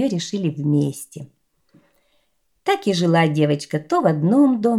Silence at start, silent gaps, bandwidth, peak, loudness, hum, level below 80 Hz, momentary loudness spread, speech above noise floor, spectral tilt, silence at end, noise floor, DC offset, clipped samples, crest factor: 0 s; none; 14.5 kHz; -4 dBFS; -19 LUFS; none; -66 dBFS; 12 LU; 49 dB; -6.5 dB/octave; 0 s; -68 dBFS; under 0.1%; under 0.1%; 16 dB